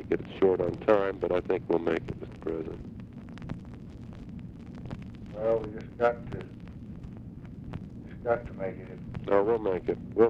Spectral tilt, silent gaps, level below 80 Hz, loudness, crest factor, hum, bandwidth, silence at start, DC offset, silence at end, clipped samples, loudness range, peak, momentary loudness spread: -8.5 dB/octave; none; -50 dBFS; -30 LUFS; 22 dB; none; 7.4 kHz; 0 s; under 0.1%; 0 s; under 0.1%; 8 LU; -10 dBFS; 18 LU